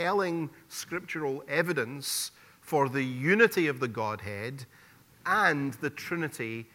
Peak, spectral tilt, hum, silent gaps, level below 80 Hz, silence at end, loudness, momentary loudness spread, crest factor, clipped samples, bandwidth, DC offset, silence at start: -8 dBFS; -4.5 dB/octave; none; none; -72 dBFS; 0.1 s; -29 LUFS; 14 LU; 22 dB; under 0.1%; 17.5 kHz; under 0.1%; 0 s